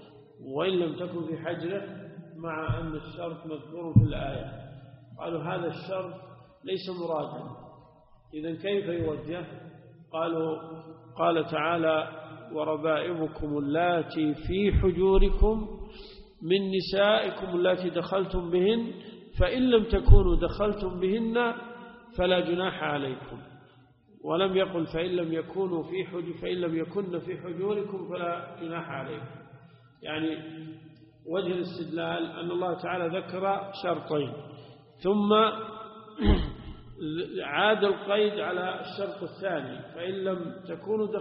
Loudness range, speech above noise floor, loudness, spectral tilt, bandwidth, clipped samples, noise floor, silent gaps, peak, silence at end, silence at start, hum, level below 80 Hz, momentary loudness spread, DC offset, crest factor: 9 LU; 31 dB; -29 LUFS; -5 dB/octave; 5.6 kHz; under 0.1%; -58 dBFS; none; -2 dBFS; 0 s; 0 s; none; -36 dBFS; 20 LU; under 0.1%; 26 dB